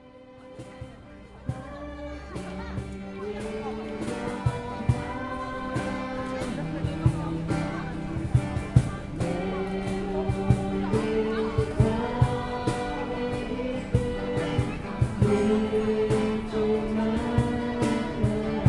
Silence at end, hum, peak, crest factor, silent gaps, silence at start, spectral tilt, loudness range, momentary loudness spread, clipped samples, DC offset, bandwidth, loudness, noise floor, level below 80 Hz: 0 s; none; -4 dBFS; 22 dB; none; 0 s; -7.5 dB/octave; 8 LU; 12 LU; under 0.1%; under 0.1%; 11.5 kHz; -28 LUFS; -48 dBFS; -40 dBFS